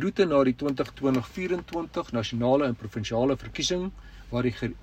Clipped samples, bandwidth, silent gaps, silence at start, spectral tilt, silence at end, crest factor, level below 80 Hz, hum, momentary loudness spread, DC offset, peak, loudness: under 0.1%; 15 kHz; none; 0 s; -5.5 dB/octave; 0 s; 18 dB; -48 dBFS; none; 9 LU; under 0.1%; -10 dBFS; -27 LUFS